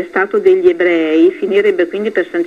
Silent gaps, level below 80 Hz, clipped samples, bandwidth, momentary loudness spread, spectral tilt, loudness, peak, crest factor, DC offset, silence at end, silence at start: none; -58 dBFS; under 0.1%; 7 kHz; 5 LU; -6.5 dB/octave; -12 LUFS; 0 dBFS; 12 dB; 0.1%; 0 s; 0 s